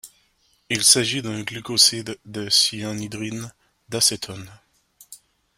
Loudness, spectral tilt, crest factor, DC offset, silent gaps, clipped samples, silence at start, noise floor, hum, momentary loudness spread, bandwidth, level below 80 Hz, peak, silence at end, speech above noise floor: -19 LUFS; -1.5 dB/octave; 24 dB; under 0.1%; none; under 0.1%; 0.05 s; -64 dBFS; none; 18 LU; 16 kHz; -60 dBFS; 0 dBFS; 0.4 s; 41 dB